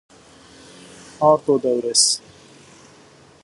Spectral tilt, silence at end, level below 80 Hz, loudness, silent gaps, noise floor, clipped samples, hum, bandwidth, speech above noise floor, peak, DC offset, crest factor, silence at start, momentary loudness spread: -2.5 dB/octave; 1.25 s; -64 dBFS; -17 LUFS; none; -49 dBFS; under 0.1%; none; 11.5 kHz; 32 dB; -2 dBFS; under 0.1%; 20 dB; 1.2 s; 4 LU